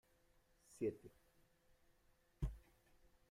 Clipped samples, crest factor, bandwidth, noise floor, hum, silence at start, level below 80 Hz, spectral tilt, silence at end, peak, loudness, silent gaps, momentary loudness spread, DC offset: under 0.1%; 22 dB; 16 kHz; -76 dBFS; none; 0.7 s; -58 dBFS; -8 dB/octave; 0.7 s; -32 dBFS; -48 LUFS; none; 20 LU; under 0.1%